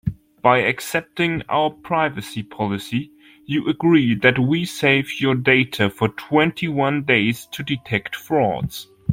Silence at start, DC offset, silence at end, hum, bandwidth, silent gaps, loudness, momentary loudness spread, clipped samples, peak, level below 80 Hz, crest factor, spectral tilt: 0.05 s; under 0.1%; 0 s; none; 16.5 kHz; none; -20 LUFS; 11 LU; under 0.1%; -2 dBFS; -50 dBFS; 18 dB; -6 dB/octave